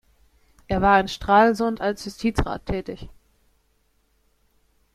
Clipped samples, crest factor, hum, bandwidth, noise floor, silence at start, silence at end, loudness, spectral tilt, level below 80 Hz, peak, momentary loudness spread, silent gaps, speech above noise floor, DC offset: under 0.1%; 20 dB; none; 14.5 kHz; -66 dBFS; 0.7 s; 1.85 s; -22 LUFS; -6 dB/octave; -40 dBFS; -4 dBFS; 13 LU; none; 45 dB; under 0.1%